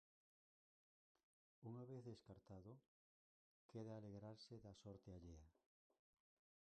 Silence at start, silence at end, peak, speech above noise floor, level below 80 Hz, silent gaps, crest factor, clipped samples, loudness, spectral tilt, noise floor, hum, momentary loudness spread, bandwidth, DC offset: 1.6 s; 1.15 s; -44 dBFS; over 30 dB; -78 dBFS; 2.88-3.69 s; 18 dB; under 0.1%; -60 LUFS; -7.5 dB/octave; under -90 dBFS; none; 7 LU; 8.8 kHz; under 0.1%